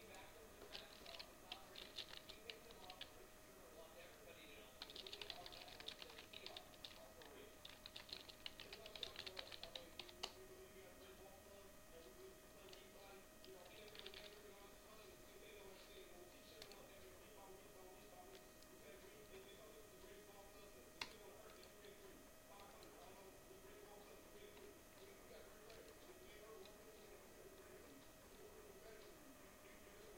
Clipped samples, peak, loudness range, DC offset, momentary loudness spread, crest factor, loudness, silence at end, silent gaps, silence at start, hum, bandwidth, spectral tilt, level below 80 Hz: under 0.1%; -28 dBFS; 7 LU; under 0.1%; 9 LU; 32 dB; -59 LUFS; 0 s; none; 0 s; none; 16.5 kHz; -2.5 dB/octave; -72 dBFS